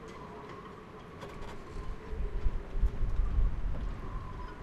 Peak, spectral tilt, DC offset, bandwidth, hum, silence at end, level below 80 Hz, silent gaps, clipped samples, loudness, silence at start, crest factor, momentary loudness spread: -16 dBFS; -7.5 dB/octave; under 0.1%; 7.2 kHz; none; 0 s; -34 dBFS; none; under 0.1%; -40 LUFS; 0 s; 16 dB; 12 LU